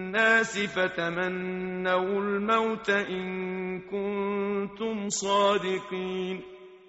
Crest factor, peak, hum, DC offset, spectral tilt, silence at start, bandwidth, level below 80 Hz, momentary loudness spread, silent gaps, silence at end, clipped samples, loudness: 20 dB; -8 dBFS; none; under 0.1%; -3 dB/octave; 0 s; 8 kHz; -64 dBFS; 9 LU; none; 0.1 s; under 0.1%; -28 LUFS